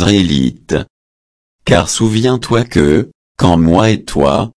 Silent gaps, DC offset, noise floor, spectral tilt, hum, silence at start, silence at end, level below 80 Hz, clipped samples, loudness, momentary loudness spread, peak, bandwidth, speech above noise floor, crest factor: 0.90-1.59 s, 3.15-3.35 s; under 0.1%; under -90 dBFS; -5.5 dB/octave; none; 0 s; 0.05 s; -32 dBFS; under 0.1%; -12 LUFS; 9 LU; 0 dBFS; 11 kHz; over 79 dB; 12 dB